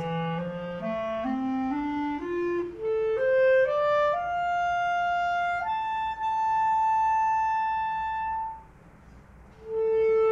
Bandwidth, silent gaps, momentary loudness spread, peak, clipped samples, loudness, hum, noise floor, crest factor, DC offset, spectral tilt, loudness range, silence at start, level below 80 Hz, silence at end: 7.6 kHz; none; 9 LU; -14 dBFS; under 0.1%; -27 LUFS; none; -51 dBFS; 12 dB; under 0.1%; -6.5 dB/octave; 3 LU; 0 s; -56 dBFS; 0 s